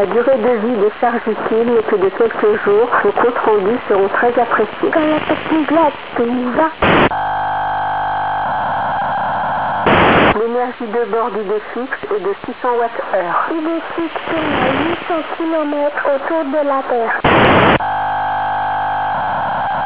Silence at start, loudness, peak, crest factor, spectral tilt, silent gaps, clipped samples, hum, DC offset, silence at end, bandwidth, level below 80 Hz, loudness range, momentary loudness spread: 0 s; -15 LUFS; 0 dBFS; 16 dB; -9.5 dB/octave; none; under 0.1%; none; 1%; 0 s; 4 kHz; -40 dBFS; 4 LU; 8 LU